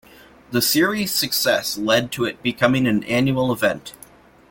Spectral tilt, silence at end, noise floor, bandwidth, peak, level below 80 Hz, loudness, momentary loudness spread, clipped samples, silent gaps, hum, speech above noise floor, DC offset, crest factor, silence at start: -4 dB/octave; 0.6 s; -48 dBFS; 17 kHz; 0 dBFS; -54 dBFS; -19 LUFS; 7 LU; under 0.1%; none; none; 28 dB; under 0.1%; 20 dB; 0.5 s